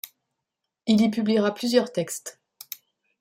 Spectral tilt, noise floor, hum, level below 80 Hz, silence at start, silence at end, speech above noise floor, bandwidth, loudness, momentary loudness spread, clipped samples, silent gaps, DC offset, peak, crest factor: -5 dB/octave; -84 dBFS; none; -70 dBFS; 0.05 s; 0.9 s; 61 dB; 16 kHz; -24 LUFS; 19 LU; under 0.1%; none; under 0.1%; -6 dBFS; 20 dB